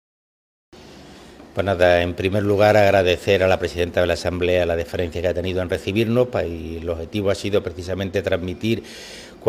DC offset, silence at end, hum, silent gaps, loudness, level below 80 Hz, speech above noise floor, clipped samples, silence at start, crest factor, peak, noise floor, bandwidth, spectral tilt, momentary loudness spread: under 0.1%; 0 s; none; none; -20 LUFS; -48 dBFS; 23 dB; under 0.1%; 0.75 s; 18 dB; -2 dBFS; -43 dBFS; 16 kHz; -6 dB/octave; 12 LU